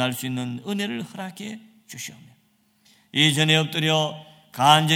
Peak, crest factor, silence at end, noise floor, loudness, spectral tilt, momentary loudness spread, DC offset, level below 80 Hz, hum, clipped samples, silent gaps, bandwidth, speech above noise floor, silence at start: 0 dBFS; 24 dB; 0 s; -64 dBFS; -21 LUFS; -4 dB/octave; 21 LU; under 0.1%; -68 dBFS; none; under 0.1%; none; 17.5 kHz; 41 dB; 0 s